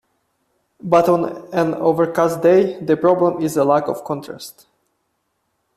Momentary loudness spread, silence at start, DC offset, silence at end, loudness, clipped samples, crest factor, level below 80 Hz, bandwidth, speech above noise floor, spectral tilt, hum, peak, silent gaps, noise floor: 13 LU; 0.85 s; under 0.1%; 1.25 s; -17 LUFS; under 0.1%; 16 dB; -60 dBFS; 14.5 kHz; 53 dB; -6.5 dB/octave; none; -2 dBFS; none; -70 dBFS